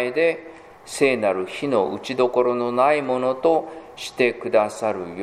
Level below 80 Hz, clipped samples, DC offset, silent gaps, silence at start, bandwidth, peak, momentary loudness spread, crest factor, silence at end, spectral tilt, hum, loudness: -64 dBFS; under 0.1%; under 0.1%; none; 0 s; 15 kHz; -4 dBFS; 10 LU; 18 dB; 0 s; -4.5 dB/octave; none; -21 LUFS